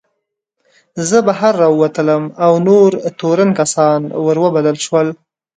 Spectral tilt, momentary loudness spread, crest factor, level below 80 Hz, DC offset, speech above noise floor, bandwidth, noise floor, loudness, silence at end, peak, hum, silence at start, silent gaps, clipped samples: -5.5 dB/octave; 6 LU; 14 dB; -62 dBFS; under 0.1%; 60 dB; 9.4 kHz; -73 dBFS; -13 LUFS; 0.45 s; 0 dBFS; none; 0.95 s; none; under 0.1%